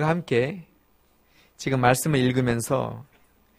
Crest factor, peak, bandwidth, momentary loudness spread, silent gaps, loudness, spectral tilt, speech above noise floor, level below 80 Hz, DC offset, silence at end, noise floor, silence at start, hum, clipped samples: 22 dB; -2 dBFS; 15.5 kHz; 13 LU; none; -24 LUFS; -5.5 dB/octave; 39 dB; -54 dBFS; under 0.1%; 0.55 s; -62 dBFS; 0 s; none; under 0.1%